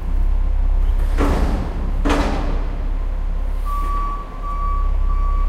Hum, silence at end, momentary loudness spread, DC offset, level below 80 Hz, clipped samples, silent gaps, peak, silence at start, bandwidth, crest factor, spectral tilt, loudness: none; 0 s; 7 LU; under 0.1%; -18 dBFS; under 0.1%; none; -4 dBFS; 0 s; 7.6 kHz; 14 dB; -7 dB/octave; -23 LUFS